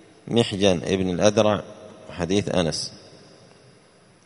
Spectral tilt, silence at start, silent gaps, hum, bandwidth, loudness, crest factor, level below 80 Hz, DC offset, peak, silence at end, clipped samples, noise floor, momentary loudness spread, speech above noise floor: -5 dB/octave; 0.25 s; none; none; 11 kHz; -22 LUFS; 22 dB; -52 dBFS; under 0.1%; -2 dBFS; 1.15 s; under 0.1%; -54 dBFS; 15 LU; 33 dB